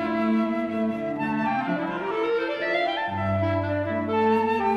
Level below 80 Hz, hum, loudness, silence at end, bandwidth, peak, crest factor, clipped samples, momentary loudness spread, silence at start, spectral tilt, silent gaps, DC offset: -60 dBFS; none; -25 LUFS; 0 s; 7.6 kHz; -12 dBFS; 12 dB; under 0.1%; 5 LU; 0 s; -8 dB/octave; none; under 0.1%